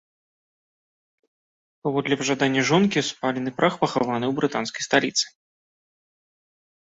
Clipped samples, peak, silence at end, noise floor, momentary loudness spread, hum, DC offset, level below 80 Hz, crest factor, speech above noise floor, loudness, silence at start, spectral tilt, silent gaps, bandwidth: under 0.1%; -6 dBFS; 1.6 s; under -90 dBFS; 7 LU; none; under 0.1%; -64 dBFS; 20 dB; over 67 dB; -23 LUFS; 1.85 s; -4 dB/octave; none; 8.2 kHz